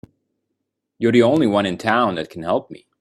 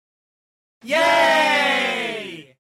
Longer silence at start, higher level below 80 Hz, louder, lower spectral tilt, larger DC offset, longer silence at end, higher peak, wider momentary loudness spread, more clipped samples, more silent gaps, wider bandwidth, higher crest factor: first, 1 s vs 0.85 s; first, -60 dBFS vs -68 dBFS; about the same, -18 LUFS vs -17 LUFS; first, -6.5 dB/octave vs -2 dB/octave; neither; about the same, 0.25 s vs 0.2 s; first, 0 dBFS vs -8 dBFS; second, 9 LU vs 14 LU; neither; neither; second, 12 kHz vs 16.5 kHz; first, 20 dB vs 12 dB